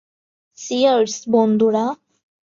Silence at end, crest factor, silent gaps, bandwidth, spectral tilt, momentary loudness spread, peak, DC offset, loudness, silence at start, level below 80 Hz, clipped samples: 0.6 s; 16 dB; none; 7.6 kHz; -5 dB/octave; 13 LU; -4 dBFS; under 0.1%; -18 LUFS; 0.6 s; -68 dBFS; under 0.1%